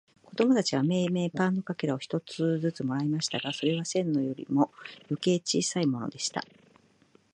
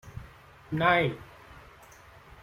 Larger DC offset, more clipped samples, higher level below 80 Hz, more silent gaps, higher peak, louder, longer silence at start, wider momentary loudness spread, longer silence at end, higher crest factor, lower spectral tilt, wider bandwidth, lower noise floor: neither; neither; second, -74 dBFS vs -56 dBFS; neither; about the same, -10 dBFS vs -8 dBFS; second, -29 LUFS vs -26 LUFS; first, 0.3 s vs 0.05 s; second, 7 LU vs 27 LU; about the same, 0.9 s vs 0.85 s; about the same, 20 dB vs 24 dB; second, -5 dB/octave vs -6.5 dB/octave; second, 11 kHz vs 16 kHz; first, -63 dBFS vs -53 dBFS